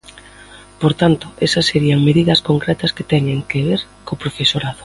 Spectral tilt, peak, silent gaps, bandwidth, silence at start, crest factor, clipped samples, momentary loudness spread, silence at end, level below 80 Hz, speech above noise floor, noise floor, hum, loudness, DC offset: -6 dB/octave; 0 dBFS; none; 11.5 kHz; 0.15 s; 16 dB; under 0.1%; 7 LU; 0 s; -44 dBFS; 25 dB; -41 dBFS; 50 Hz at -35 dBFS; -16 LUFS; under 0.1%